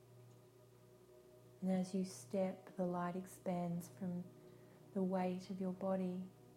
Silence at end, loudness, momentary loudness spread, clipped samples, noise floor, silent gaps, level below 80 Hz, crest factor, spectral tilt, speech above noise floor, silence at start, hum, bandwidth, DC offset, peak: 0 s; -43 LUFS; 23 LU; under 0.1%; -65 dBFS; none; -80 dBFS; 16 dB; -7.5 dB/octave; 23 dB; 0 s; none; 15.5 kHz; under 0.1%; -28 dBFS